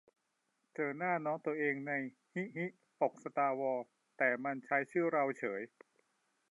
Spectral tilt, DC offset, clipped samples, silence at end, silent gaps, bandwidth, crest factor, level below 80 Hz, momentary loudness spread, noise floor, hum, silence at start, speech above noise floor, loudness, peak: -8 dB/octave; under 0.1%; under 0.1%; 0.85 s; none; 11 kHz; 20 dB; under -90 dBFS; 10 LU; -82 dBFS; none; 0.8 s; 46 dB; -37 LUFS; -18 dBFS